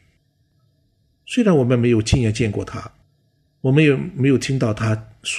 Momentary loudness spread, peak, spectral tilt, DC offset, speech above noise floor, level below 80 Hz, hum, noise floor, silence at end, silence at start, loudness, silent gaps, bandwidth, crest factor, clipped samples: 10 LU; -2 dBFS; -6.5 dB/octave; under 0.1%; 45 dB; -40 dBFS; none; -63 dBFS; 0 s; 1.3 s; -18 LUFS; none; 11 kHz; 18 dB; under 0.1%